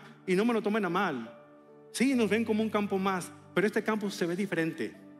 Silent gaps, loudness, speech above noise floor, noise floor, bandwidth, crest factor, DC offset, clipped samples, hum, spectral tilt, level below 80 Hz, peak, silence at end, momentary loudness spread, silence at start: none; -30 LUFS; 25 dB; -54 dBFS; 14.5 kHz; 16 dB; under 0.1%; under 0.1%; none; -5.5 dB/octave; -80 dBFS; -14 dBFS; 0 s; 8 LU; 0 s